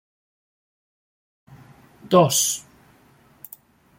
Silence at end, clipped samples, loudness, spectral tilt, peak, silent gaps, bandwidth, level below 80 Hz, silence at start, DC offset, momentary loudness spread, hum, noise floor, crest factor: 1.4 s; under 0.1%; -19 LUFS; -4 dB/octave; -4 dBFS; none; 16.5 kHz; -66 dBFS; 2.05 s; under 0.1%; 26 LU; none; -55 dBFS; 22 dB